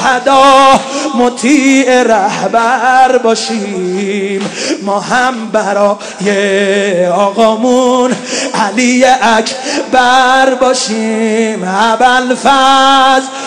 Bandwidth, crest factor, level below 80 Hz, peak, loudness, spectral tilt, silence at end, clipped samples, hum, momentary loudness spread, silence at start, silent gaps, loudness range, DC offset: 12 kHz; 10 dB; -48 dBFS; 0 dBFS; -9 LUFS; -3 dB/octave; 0 s; 3%; none; 9 LU; 0 s; none; 4 LU; under 0.1%